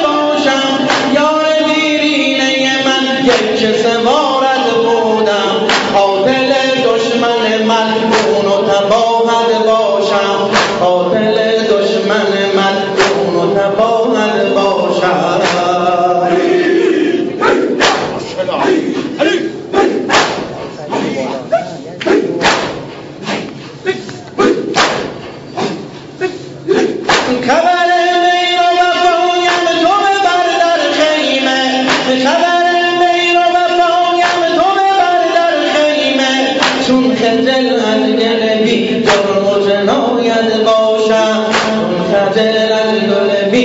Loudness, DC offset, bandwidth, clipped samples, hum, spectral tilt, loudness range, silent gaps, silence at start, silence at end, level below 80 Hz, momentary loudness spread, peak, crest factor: -11 LUFS; under 0.1%; 8 kHz; under 0.1%; none; -4 dB/octave; 4 LU; none; 0 s; 0 s; -50 dBFS; 7 LU; 0 dBFS; 12 dB